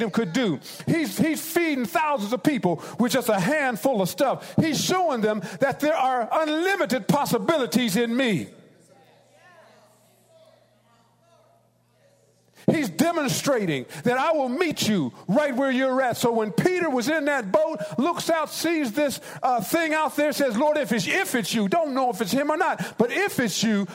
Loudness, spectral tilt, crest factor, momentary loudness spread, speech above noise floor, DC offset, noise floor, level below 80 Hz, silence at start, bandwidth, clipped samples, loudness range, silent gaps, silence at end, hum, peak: -23 LUFS; -4.5 dB/octave; 18 dB; 3 LU; 39 dB; under 0.1%; -62 dBFS; -66 dBFS; 0 s; 16 kHz; under 0.1%; 4 LU; none; 0 s; 60 Hz at -55 dBFS; -6 dBFS